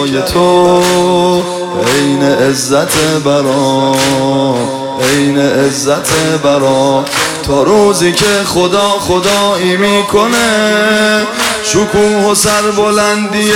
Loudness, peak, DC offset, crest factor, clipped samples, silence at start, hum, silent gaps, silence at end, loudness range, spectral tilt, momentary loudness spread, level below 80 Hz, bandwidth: -10 LUFS; 0 dBFS; under 0.1%; 10 dB; under 0.1%; 0 s; none; none; 0 s; 1 LU; -3.5 dB/octave; 4 LU; -40 dBFS; 17 kHz